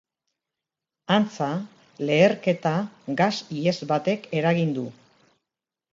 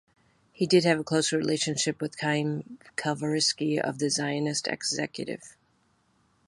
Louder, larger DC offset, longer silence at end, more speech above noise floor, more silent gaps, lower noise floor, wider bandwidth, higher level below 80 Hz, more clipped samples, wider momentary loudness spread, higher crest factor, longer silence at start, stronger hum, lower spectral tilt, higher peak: first, -24 LUFS vs -27 LUFS; neither; about the same, 1 s vs 0.95 s; first, 64 dB vs 41 dB; neither; first, -87 dBFS vs -68 dBFS; second, 7.6 kHz vs 11.5 kHz; about the same, -70 dBFS vs -70 dBFS; neither; about the same, 12 LU vs 10 LU; about the same, 20 dB vs 20 dB; first, 1.1 s vs 0.6 s; neither; first, -6.5 dB/octave vs -4 dB/octave; first, -4 dBFS vs -8 dBFS